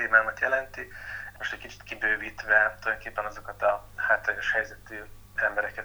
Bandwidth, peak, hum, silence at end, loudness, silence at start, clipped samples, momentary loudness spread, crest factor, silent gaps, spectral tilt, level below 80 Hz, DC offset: over 20 kHz; -6 dBFS; none; 0 s; -27 LUFS; 0 s; under 0.1%; 17 LU; 22 dB; none; -3.5 dB/octave; -52 dBFS; under 0.1%